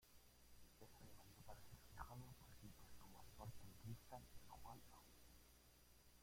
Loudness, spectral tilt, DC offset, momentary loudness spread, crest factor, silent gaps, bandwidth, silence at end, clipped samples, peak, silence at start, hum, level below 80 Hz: -63 LUFS; -4.5 dB/octave; under 0.1%; 9 LU; 22 dB; none; 16.5 kHz; 0 s; under 0.1%; -40 dBFS; 0 s; 60 Hz at -70 dBFS; -70 dBFS